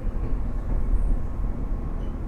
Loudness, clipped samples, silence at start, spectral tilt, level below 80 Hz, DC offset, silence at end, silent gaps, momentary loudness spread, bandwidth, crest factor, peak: -31 LUFS; under 0.1%; 0 s; -9.5 dB/octave; -26 dBFS; under 0.1%; 0 s; none; 4 LU; 3.1 kHz; 12 dB; -12 dBFS